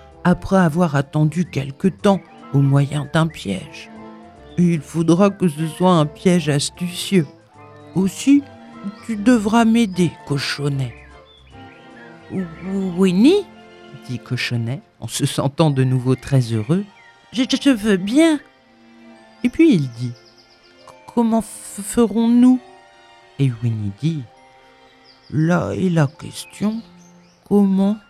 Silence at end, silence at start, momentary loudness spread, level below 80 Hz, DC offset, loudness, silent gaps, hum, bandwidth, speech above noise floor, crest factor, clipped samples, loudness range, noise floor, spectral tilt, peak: 0.1 s; 0.25 s; 15 LU; -50 dBFS; under 0.1%; -18 LUFS; none; none; 14.5 kHz; 32 dB; 18 dB; under 0.1%; 4 LU; -50 dBFS; -6.5 dB/octave; 0 dBFS